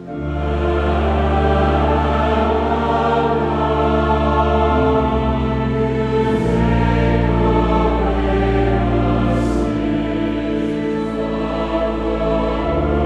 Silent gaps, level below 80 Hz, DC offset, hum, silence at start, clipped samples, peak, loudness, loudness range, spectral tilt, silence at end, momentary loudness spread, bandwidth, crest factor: none; -24 dBFS; under 0.1%; none; 0 s; under 0.1%; -2 dBFS; -17 LUFS; 3 LU; -8 dB/octave; 0 s; 5 LU; 9 kHz; 14 dB